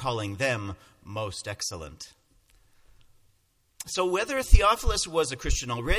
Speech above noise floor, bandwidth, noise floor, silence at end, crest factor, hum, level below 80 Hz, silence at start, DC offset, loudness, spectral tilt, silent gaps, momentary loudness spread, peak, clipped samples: 42 dB; 15.5 kHz; -67 dBFS; 0 s; 26 dB; none; -30 dBFS; 0 s; under 0.1%; -27 LUFS; -4 dB/octave; none; 20 LU; -2 dBFS; under 0.1%